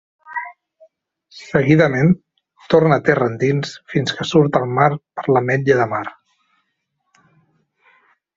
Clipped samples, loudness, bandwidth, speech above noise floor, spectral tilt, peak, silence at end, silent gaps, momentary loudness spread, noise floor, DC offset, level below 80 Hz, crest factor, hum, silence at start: under 0.1%; -17 LUFS; 7.6 kHz; 56 dB; -7 dB/octave; -2 dBFS; 2.25 s; none; 15 LU; -72 dBFS; under 0.1%; -54 dBFS; 18 dB; none; 0.3 s